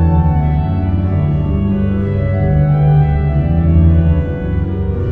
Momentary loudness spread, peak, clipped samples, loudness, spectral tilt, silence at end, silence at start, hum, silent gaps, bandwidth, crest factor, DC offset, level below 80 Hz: 7 LU; -2 dBFS; under 0.1%; -14 LUFS; -12 dB/octave; 0 s; 0 s; none; none; 3.8 kHz; 12 dB; under 0.1%; -20 dBFS